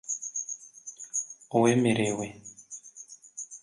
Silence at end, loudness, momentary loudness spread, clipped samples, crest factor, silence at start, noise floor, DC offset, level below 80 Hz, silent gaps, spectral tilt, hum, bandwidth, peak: 0.05 s; -28 LUFS; 20 LU; under 0.1%; 20 dB; 0.05 s; -50 dBFS; under 0.1%; -68 dBFS; none; -4.5 dB/octave; none; 11.5 kHz; -10 dBFS